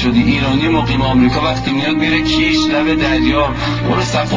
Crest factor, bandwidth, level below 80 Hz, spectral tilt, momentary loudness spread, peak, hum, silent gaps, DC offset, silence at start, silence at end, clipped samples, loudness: 12 dB; 7.6 kHz; -28 dBFS; -5.5 dB/octave; 3 LU; -2 dBFS; none; none; 0.5%; 0 s; 0 s; under 0.1%; -14 LUFS